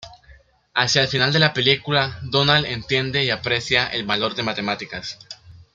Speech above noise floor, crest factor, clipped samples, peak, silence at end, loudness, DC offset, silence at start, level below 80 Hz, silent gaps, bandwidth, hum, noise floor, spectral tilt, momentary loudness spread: 30 dB; 20 dB; under 0.1%; -2 dBFS; 0.15 s; -19 LUFS; under 0.1%; 0 s; -50 dBFS; none; 7.8 kHz; none; -51 dBFS; -4 dB/octave; 14 LU